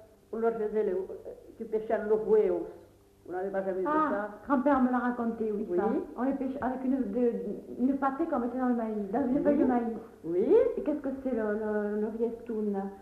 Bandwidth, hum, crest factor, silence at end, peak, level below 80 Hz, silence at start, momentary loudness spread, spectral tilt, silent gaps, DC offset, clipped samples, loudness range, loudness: 5 kHz; none; 16 dB; 0 s; -14 dBFS; -60 dBFS; 0 s; 10 LU; -9 dB/octave; none; under 0.1%; under 0.1%; 2 LU; -30 LUFS